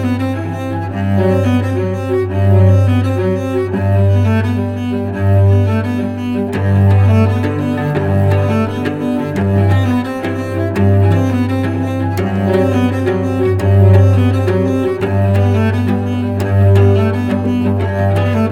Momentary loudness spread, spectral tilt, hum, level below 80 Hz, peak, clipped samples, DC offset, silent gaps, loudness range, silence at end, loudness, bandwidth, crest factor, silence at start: 7 LU; -8.5 dB/octave; none; -48 dBFS; 0 dBFS; under 0.1%; under 0.1%; none; 2 LU; 0 s; -14 LUFS; 6.8 kHz; 12 dB; 0 s